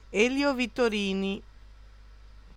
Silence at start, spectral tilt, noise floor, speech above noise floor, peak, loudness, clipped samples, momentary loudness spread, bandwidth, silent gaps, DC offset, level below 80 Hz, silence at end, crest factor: 0.1 s; -4.5 dB/octave; -50 dBFS; 23 dB; -10 dBFS; -27 LUFS; under 0.1%; 8 LU; 15.5 kHz; none; under 0.1%; -50 dBFS; 0.05 s; 18 dB